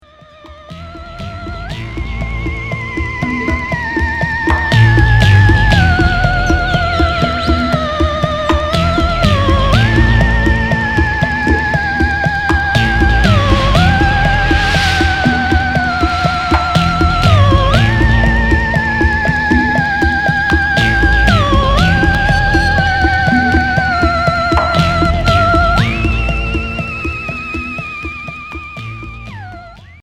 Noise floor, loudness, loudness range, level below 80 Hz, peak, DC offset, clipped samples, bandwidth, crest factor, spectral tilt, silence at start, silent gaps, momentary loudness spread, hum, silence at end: -39 dBFS; -12 LUFS; 7 LU; -18 dBFS; 0 dBFS; under 0.1%; under 0.1%; 12.5 kHz; 12 dB; -6 dB/octave; 0.45 s; none; 13 LU; none; 0.1 s